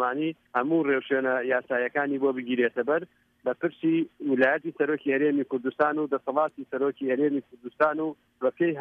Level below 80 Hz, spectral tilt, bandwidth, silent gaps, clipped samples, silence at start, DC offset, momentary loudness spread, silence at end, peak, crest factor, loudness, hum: -76 dBFS; -8.5 dB/octave; 4.5 kHz; none; under 0.1%; 0 s; under 0.1%; 6 LU; 0 s; -10 dBFS; 18 dB; -27 LUFS; none